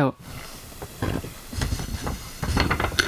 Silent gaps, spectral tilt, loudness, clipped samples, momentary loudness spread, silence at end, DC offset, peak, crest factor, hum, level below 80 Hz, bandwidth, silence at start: none; -4.5 dB/octave; -28 LUFS; under 0.1%; 16 LU; 0 s; under 0.1%; -4 dBFS; 22 dB; none; -34 dBFS; 16 kHz; 0 s